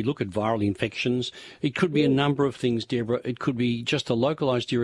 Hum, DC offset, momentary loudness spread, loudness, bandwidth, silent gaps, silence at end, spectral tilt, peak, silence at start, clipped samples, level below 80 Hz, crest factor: none; under 0.1%; 6 LU; -25 LUFS; 11.5 kHz; none; 0 s; -6.5 dB/octave; -8 dBFS; 0 s; under 0.1%; -60 dBFS; 16 dB